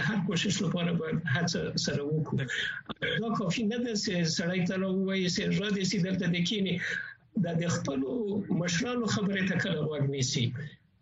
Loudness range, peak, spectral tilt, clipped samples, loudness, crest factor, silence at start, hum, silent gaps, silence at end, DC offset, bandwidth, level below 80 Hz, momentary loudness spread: 1 LU; -14 dBFS; -5 dB/octave; under 0.1%; -30 LUFS; 16 dB; 0 s; none; none; 0.25 s; under 0.1%; 8 kHz; -62 dBFS; 3 LU